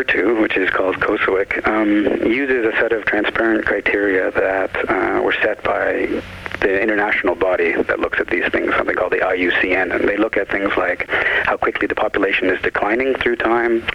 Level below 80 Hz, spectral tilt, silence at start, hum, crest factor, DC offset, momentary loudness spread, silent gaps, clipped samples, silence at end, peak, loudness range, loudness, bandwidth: -44 dBFS; -6 dB/octave; 0 s; none; 14 dB; under 0.1%; 3 LU; none; under 0.1%; 0 s; -4 dBFS; 1 LU; -17 LUFS; 11 kHz